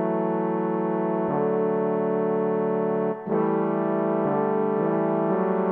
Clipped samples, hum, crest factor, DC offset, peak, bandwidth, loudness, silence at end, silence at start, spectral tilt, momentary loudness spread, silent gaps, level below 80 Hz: under 0.1%; none; 14 dB; under 0.1%; -10 dBFS; 3.5 kHz; -24 LUFS; 0 s; 0 s; -12 dB/octave; 2 LU; none; -72 dBFS